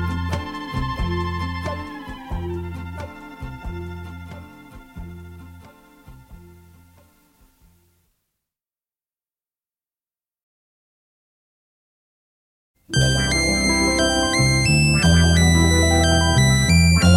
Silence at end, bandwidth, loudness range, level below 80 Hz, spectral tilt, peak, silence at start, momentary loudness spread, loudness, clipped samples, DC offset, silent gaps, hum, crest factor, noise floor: 0 s; 14.5 kHz; 22 LU; -32 dBFS; -4.5 dB/octave; -2 dBFS; 0 s; 21 LU; -18 LUFS; under 0.1%; under 0.1%; 10.43-12.74 s; none; 18 dB; under -90 dBFS